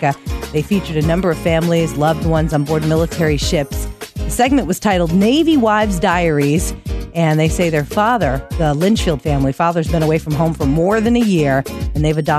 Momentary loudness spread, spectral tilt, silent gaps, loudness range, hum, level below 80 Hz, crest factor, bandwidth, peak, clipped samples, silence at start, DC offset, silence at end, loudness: 6 LU; -6 dB/octave; none; 2 LU; none; -28 dBFS; 14 dB; 14 kHz; -2 dBFS; under 0.1%; 0 s; under 0.1%; 0 s; -16 LUFS